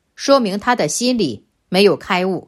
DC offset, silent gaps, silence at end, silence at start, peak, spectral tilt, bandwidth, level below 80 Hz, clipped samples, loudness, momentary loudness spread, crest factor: under 0.1%; none; 0.05 s; 0.2 s; 0 dBFS; -4 dB/octave; 15.5 kHz; -56 dBFS; under 0.1%; -16 LUFS; 6 LU; 16 dB